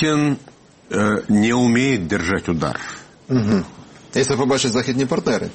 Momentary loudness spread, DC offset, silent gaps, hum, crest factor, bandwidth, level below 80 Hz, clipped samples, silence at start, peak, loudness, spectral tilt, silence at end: 10 LU; under 0.1%; none; none; 14 dB; 8.8 kHz; -48 dBFS; under 0.1%; 0 s; -4 dBFS; -19 LUFS; -5 dB/octave; 0 s